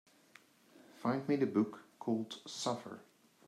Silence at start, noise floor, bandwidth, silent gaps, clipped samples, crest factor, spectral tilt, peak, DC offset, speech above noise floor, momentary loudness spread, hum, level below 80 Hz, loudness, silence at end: 0.8 s; -65 dBFS; 14 kHz; none; under 0.1%; 20 dB; -5.5 dB/octave; -18 dBFS; under 0.1%; 28 dB; 11 LU; none; -88 dBFS; -37 LUFS; 0.45 s